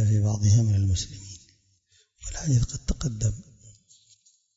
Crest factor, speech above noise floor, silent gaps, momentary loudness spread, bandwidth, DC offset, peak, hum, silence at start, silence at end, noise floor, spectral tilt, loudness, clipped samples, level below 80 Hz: 16 dB; 41 dB; none; 21 LU; 7.8 kHz; under 0.1%; -10 dBFS; none; 0 s; 0.85 s; -65 dBFS; -5.5 dB/octave; -25 LUFS; under 0.1%; -40 dBFS